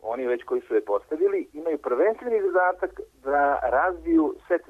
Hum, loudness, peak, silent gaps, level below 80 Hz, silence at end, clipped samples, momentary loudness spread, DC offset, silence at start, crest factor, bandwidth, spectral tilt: none; -25 LUFS; -12 dBFS; none; -54 dBFS; 0.1 s; under 0.1%; 7 LU; under 0.1%; 0.05 s; 12 dB; 6 kHz; -7 dB/octave